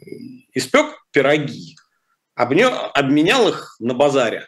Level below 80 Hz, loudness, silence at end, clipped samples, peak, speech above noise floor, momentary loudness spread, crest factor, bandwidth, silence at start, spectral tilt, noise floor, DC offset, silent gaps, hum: -62 dBFS; -17 LUFS; 0 s; under 0.1%; -4 dBFS; 52 dB; 16 LU; 14 dB; 13 kHz; 0.1 s; -4.5 dB/octave; -69 dBFS; under 0.1%; none; none